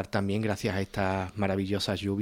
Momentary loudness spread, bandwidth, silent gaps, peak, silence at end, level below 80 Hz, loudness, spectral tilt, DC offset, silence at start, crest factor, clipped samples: 1 LU; 16.5 kHz; none; -12 dBFS; 0 s; -54 dBFS; -30 LUFS; -6 dB/octave; under 0.1%; 0 s; 16 dB; under 0.1%